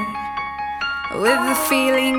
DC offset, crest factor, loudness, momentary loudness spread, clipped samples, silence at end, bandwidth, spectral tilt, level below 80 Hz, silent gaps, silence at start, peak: under 0.1%; 16 dB; -20 LUFS; 10 LU; under 0.1%; 0 s; 19.5 kHz; -2.5 dB/octave; -48 dBFS; none; 0 s; -4 dBFS